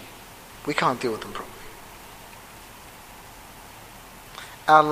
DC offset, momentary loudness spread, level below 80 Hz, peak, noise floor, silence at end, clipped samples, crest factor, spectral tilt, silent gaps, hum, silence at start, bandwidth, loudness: under 0.1%; 20 LU; -54 dBFS; -2 dBFS; -45 dBFS; 0 s; under 0.1%; 26 dB; -4 dB/octave; none; none; 0 s; 15.5 kHz; -24 LUFS